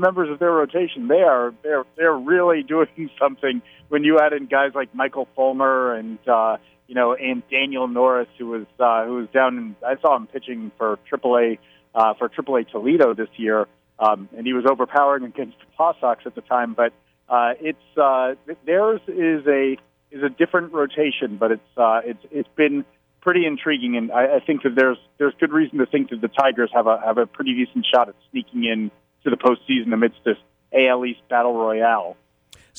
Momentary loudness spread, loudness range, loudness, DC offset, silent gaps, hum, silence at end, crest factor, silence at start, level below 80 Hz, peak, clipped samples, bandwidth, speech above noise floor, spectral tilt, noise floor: 9 LU; 2 LU; -20 LUFS; under 0.1%; none; none; 0.65 s; 16 dB; 0 s; -70 dBFS; -4 dBFS; under 0.1%; 5 kHz; 33 dB; -7 dB/octave; -52 dBFS